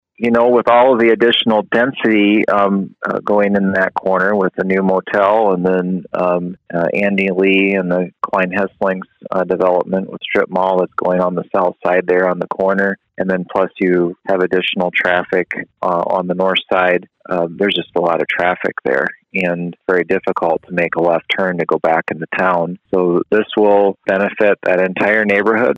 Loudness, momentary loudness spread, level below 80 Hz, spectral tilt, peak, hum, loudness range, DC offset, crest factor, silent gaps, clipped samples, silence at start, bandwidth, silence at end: -15 LUFS; 7 LU; -58 dBFS; -7.5 dB/octave; -2 dBFS; none; 3 LU; under 0.1%; 14 dB; none; under 0.1%; 0.2 s; 7.6 kHz; 0 s